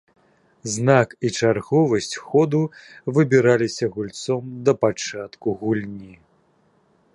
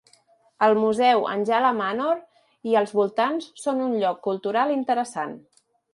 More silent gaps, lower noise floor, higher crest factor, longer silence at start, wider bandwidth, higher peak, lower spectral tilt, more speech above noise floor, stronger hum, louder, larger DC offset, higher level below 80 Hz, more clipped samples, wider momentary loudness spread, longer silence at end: neither; about the same, -61 dBFS vs -60 dBFS; about the same, 20 dB vs 18 dB; about the same, 0.65 s vs 0.6 s; about the same, 11.5 kHz vs 11.5 kHz; first, -2 dBFS vs -6 dBFS; about the same, -5.5 dB/octave vs -5 dB/octave; about the same, 41 dB vs 38 dB; neither; about the same, -21 LUFS vs -23 LUFS; neither; first, -60 dBFS vs -74 dBFS; neither; first, 12 LU vs 9 LU; first, 1 s vs 0.55 s